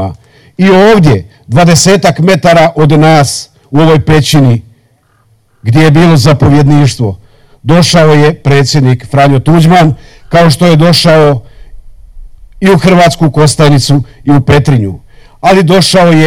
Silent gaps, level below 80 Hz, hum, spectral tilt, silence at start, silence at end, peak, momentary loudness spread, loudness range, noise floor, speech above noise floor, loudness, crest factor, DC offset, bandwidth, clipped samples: none; -30 dBFS; none; -6 dB/octave; 0 s; 0 s; 0 dBFS; 8 LU; 2 LU; -49 dBFS; 44 dB; -6 LUFS; 6 dB; 3%; 15.5 kHz; under 0.1%